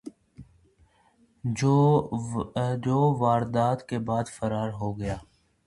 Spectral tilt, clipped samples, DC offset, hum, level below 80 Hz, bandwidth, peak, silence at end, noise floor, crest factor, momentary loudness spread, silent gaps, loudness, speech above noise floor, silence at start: -7.5 dB/octave; under 0.1%; under 0.1%; none; -52 dBFS; 11.5 kHz; -10 dBFS; 0.45 s; -63 dBFS; 18 dB; 12 LU; none; -26 LUFS; 38 dB; 0.05 s